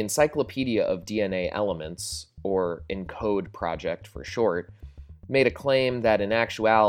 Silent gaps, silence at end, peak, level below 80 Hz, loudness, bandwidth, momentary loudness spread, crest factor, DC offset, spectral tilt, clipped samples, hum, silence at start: none; 0 s; -6 dBFS; -50 dBFS; -26 LUFS; 17 kHz; 11 LU; 20 dB; under 0.1%; -4.5 dB/octave; under 0.1%; none; 0 s